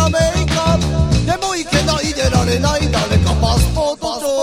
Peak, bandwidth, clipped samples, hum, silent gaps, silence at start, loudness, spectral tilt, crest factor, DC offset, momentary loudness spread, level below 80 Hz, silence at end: 0 dBFS; 16 kHz; under 0.1%; none; none; 0 s; -16 LUFS; -5 dB/octave; 14 dB; under 0.1%; 4 LU; -24 dBFS; 0 s